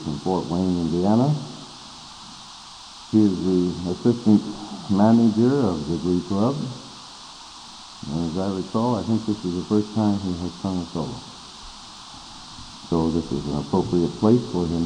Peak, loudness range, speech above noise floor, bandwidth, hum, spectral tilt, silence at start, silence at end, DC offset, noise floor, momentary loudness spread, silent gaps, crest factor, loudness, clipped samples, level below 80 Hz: -6 dBFS; 7 LU; 20 dB; 10 kHz; none; -7 dB/octave; 0 s; 0 s; under 0.1%; -42 dBFS; 20 LU; none; 18 dB; -22 LUFS; under 0.1%; -48 dBFS